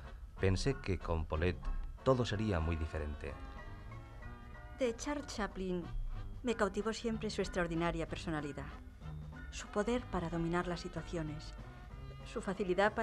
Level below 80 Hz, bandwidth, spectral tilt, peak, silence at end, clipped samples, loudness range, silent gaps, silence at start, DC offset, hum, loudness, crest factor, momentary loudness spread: -46 dBFS; 12.5 kHz; -6 dB/octave; -16 dBFS; 0 s; under 0.1%; 5 LU; none; 0 s; under 0.1%; none; -38 LUFS; 22 dB; 16 LU